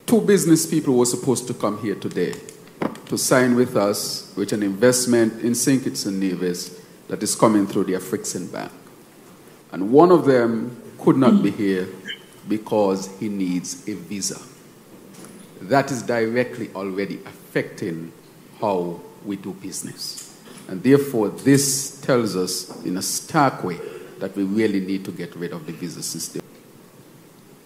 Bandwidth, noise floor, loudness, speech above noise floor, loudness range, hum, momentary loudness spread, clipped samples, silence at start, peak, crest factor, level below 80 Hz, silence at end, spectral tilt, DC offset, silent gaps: 16 kHz; -47 dBFS; -21 LUFS; 27 dB; 8 LU; none; 17 LU; under 0.1%; 0.1 s; 0 dBFS; 22 dB; -68 dBFS; 0.65 s; -4.5 dB/octave; under 0.1%; none